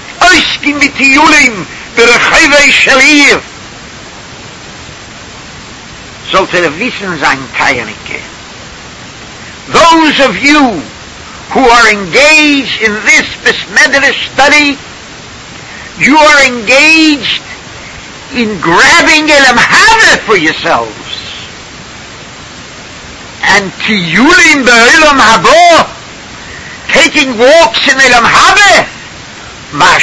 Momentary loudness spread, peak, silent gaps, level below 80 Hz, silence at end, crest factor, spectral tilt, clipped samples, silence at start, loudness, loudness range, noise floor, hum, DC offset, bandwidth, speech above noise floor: 24 LU; 0 dBFS; none; -36 dBFS; 0 s; 8 dB; -2 dB/octave; 4%; 0 s; -4 LUFS; 9 LU; -27 dBFS; none; under 0.1%; 11 kHz; 22 dB